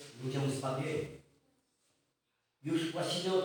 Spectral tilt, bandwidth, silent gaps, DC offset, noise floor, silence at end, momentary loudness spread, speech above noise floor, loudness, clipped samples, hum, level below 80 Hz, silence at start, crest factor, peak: -5.5 dB/octave; over 20 kHz; none; under 0.1%; -82 dBFS; 0 s; 12 LU; 48 dB; -36 LUFS; under 0.1%; none; -76 dBFS; 0 s; 18 dB; -20 dBFS